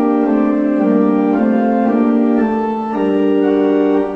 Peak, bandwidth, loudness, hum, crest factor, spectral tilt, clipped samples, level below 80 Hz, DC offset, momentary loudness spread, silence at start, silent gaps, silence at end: -2 dBFS; 4.7 kHz; -14 LUFS; none; 10 dB; -9 dB/octave; under 0.1%; -48 dBFS; under 0.1%; 3 LU; 0 s; none; 0 s